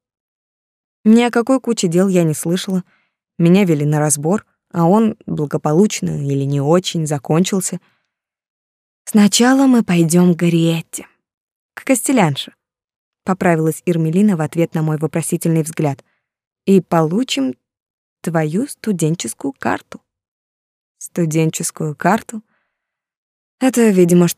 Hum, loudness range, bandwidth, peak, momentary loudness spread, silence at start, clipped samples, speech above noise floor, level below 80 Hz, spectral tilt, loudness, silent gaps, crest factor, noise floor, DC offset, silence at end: none; 7 LU; 15.5 kHz; -2 dBFS; 11 LU; 1.05 s; under 0.1%; 64 dB; -62 dBFS; -5.5 dB/octave; -16 LUFS; 8.50-9.05 s, 11.34-11.69 s, 12.84-12.88 s, 12.96-13.12 s, 16.47-16.56 s, 17.82-18.17 s, 20.28-20.95 s, 23.17-23.58 s; 16 dB; -79 dBFS; under 0.1%; 0.05 s